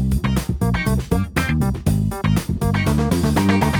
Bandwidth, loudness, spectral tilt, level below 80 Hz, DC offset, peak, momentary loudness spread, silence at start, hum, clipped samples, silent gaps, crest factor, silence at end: over 20 kHz; -20 LUFS; -6.5 dB/octave; -28 dBFS; under 0.1%; -4 dBFS; 4 LU; 0 s; none; under 0.1%; none; 14 dB; 0 s